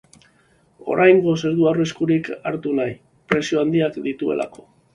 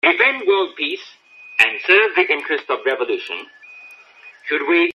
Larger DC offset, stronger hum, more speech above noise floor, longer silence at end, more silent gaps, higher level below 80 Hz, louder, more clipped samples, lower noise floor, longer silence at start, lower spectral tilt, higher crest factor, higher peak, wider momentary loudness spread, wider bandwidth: neither; neither; first, 39 dB vs 27 dB; first, 0.45 s vs 0.05 s; neither; first, -58 dBFS vs -74 dBFS; second, -20 LUFS vs -17 LUFS; neither; first, -58 dBFS vs -45 dBFS; first, 0.85 s vs 0.05 s; first, -6.5 dB/octave vs -2.5 dB/octave; about the same, 20 dB vs 20 dB; about the same, 0 dBFS vs 0 dBFS; second, 13 LU vs 16 LU; second, 10.5 kHz vs 13 kHz